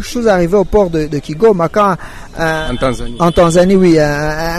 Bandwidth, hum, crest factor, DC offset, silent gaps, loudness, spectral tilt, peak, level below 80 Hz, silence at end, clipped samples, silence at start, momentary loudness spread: 13.5 kHz; none; 10 dB; under 0.1%; none; -12 LUFS; -6 dB/octave; -2 dBFS; -28 dBFS; 0 s; under 0.1%; 0 s; 9 LU